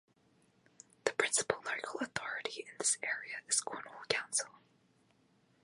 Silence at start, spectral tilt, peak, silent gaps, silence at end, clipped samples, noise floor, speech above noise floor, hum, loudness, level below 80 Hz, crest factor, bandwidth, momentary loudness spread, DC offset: 1.05 s; -0.5 dB/octave; -12 dBFS; none; 1.15 s; under 0.1%; -71 dBFS; 34 dB; none; -35 LUFS; -78 dBFS; 28 dB; 11.5 kHz; 9 LU; under 0.1%